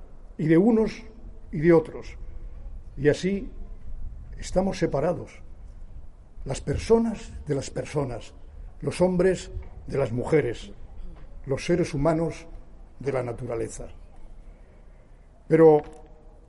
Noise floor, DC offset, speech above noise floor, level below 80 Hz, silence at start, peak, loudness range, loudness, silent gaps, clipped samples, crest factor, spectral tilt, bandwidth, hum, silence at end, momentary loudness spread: -50 dBFS; under 0.1%; 26 dB; -40 dBFS; 0 s; -6 dBFS; 5 LU; -25 LUFS; none; under 0.1%; 20 dB; -7 dB/octave; 11.5 kHz; none; 0.15 s; 24 LU